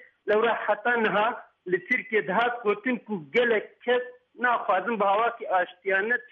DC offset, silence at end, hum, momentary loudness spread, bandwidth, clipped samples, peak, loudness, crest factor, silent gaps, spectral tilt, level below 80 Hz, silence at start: under 0.1%; 0.05 s; none; 5 LU; 6.2 kHz; under 0.1%; -12 dBFS; -26 LUFS; 14 dB; none; -6.5 dB/octave; -76 dBFS; 0 s